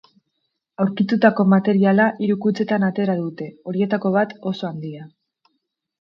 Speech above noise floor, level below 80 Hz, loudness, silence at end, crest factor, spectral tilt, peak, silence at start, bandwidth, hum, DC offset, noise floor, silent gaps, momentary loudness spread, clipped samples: 56 dB; -68 dBFS; -19 LUFS; 0.95 s; 20 dB; -9 dB/octave; 0 dBFS; 0.8 s; 6 kHz; none; under 0.1%; -75 dBFS; none; 13 LU; under 0.1%